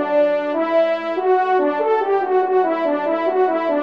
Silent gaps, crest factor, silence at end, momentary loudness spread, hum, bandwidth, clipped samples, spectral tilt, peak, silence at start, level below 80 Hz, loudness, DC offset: none; 12 dB; 0 s; 3 LU; none; 6 kHz; under 0.1%; -6 dB/octave; -6 dBFS; 0 s; -72 dBFS; -18 LUFS; 0.2%